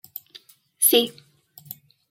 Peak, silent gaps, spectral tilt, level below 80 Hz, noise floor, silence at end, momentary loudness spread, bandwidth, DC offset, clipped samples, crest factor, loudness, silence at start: -6 dBFS; none; -1 dB/octave; -78 dBFS; -51 dBFS; 1 s; 24 LU; 17 kHz; under 0.1%; under 0.1%; 22 dB; -19 LUFS; 0.8 s